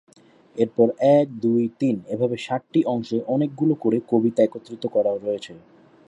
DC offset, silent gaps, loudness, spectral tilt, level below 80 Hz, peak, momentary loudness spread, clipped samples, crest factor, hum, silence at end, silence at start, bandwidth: under 0.1%; none; -22 LUFS; -8 dB/octave; -70 dBFS; -4 dBFS; 9 LU; under 0.1%; 18 dB; none; 0.5 s; 0.55 s; 10.5 kHz